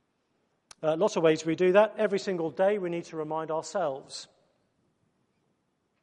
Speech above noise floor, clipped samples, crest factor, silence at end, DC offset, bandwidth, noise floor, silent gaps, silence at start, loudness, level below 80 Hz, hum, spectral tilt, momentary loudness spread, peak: 48 dB; under 0.1%; 22 dB; 1.8 s; under 0.1%; 10.5 kHz; -75 dBFS; none; 0.8 s; -27 LUFS; -80 dBFS; none; -5.5 dB/octave; 11 LU; -8 dBFS